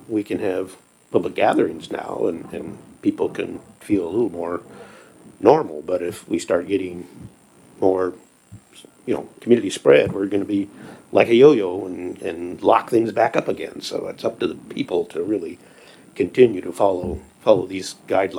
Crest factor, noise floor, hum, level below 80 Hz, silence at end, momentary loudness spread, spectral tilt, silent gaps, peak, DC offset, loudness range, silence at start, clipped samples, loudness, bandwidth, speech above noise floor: 20 dB; -46 dBFS; none; -54 dBFS; 0 s; 14 LU; -6 dB/octave; none; 0 dBFS; under 0.1%; 7 LU; 0.1 s; under 0.1%; -21 LUFS; 19 kHz; 26 dB